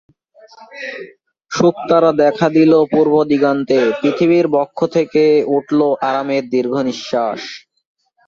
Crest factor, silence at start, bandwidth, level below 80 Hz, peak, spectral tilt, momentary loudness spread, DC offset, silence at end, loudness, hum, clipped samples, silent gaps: 14 dB; 0.6 s; 7.4 kHz; -58 dBFS; -2 dBFS; -6.5 dB/octave; 15 LU; under 0.1%; 0.7 s; -14 LUFS; none; under 0.1%; none